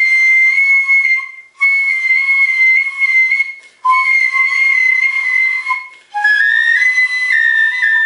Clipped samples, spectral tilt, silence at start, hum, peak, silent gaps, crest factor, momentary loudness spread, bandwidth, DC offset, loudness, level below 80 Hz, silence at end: under 0.1%; 4.5 dB/octave; 0 s; none; -2 dBFS; none; 10 dB; 8 LU; 11 kHz; under 0.1%; -10 LUFS; -80 dBFS; 0 s